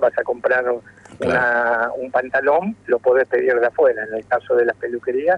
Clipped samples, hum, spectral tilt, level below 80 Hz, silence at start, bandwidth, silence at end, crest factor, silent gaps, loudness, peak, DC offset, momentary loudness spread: under 0.1%; none; -6.5 dB/octave; -58 dBFS; 0 s; 9.2 kHz; 0 s; 14 dB; none; -19 LUFS; -6 dBFS; under 0.1%; 7 LU